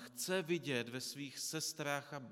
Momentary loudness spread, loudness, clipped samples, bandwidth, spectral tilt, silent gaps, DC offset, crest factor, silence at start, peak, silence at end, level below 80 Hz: 6 LU; -40 LUFS; under 0.1%; 17 kHz; -3 dB/octave; none; under 0.1%; 20 dB; 0 s; -22 dBFS; 0 s; under -90 dBFS